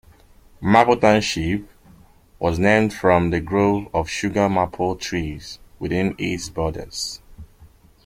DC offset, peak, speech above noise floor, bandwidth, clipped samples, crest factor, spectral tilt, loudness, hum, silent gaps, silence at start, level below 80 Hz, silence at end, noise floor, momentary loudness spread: under 0.1%; -2 dBFS; 30 dB; 16 kHz; under 0.1%; 20 dB; -5.5 dB/octave; -20 LUFS; none; none; 0.6 s; -42 dBFS; 0.4 s; -50 dBFS; 12 LU